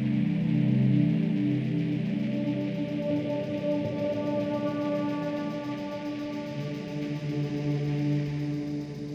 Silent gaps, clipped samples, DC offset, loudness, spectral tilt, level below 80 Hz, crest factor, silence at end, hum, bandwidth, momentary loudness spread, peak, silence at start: none; under 0.1%; under 0.1%; -29 LUFS; -8.5 dB/octave; -62 dBFS; 14 dB; 0 s; none; 7.6 kHz; 9 LU; -14 dBFS; 0 s